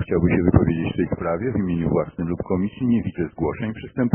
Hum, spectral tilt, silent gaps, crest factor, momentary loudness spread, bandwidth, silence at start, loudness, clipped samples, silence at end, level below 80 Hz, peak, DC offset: none; -7 dB/octave; none; 20 dB; 9 LU; 3.3 kHz; 0 s; -22 LUFS; under 0.1%; 0 s; -38 dBFS; -2 dBFS; under 0.1%